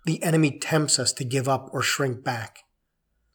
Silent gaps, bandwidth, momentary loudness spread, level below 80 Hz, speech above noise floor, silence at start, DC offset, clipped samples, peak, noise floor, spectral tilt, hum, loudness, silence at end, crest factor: none; over 20 kHz; 9 LU; -72 dBFS; 50 dB; 0.05 s; under 0.1%; under 0.1%; -4 dBFS; -75 dBFS; -4 dB/octave; none; -24 LUFS; 0.75 s; 22 dB